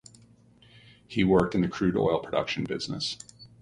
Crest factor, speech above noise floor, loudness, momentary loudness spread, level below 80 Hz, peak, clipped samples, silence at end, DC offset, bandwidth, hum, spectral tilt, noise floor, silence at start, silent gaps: 20 dB; 31 dB; -27 LUFS; 11 LU; -52 dBFS; -8 dBFS; under 0.1%; 0.15 s; under 0.1%; 11 kHz; none; -6 dB/octave; -57 dBFS; 1.1 s; none